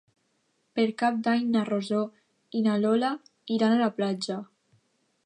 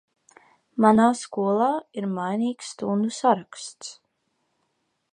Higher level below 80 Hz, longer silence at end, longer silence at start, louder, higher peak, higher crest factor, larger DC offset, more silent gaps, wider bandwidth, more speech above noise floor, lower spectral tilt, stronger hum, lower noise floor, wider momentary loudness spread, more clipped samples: second, -80 dBFS vs -68 dBFS; second, 0.8 s vs 1.2 s; about the same, 0.75 s vs 0.75 s; second, -27 LUFS vs -23 LUFS; second, -12 dBFS vs -2 dBFS; second, 16 dB vs 22 dB; neither; neither; about the same, 10 kHz vs 10.5 kHz; second, 47 dB vs 51 dB; about the same, -6 dB/octave vs -5.5 dB/octave; neither; about the same, -73 dBFS vs -74 dBFS; second, 11 LU vs 18 LU; neither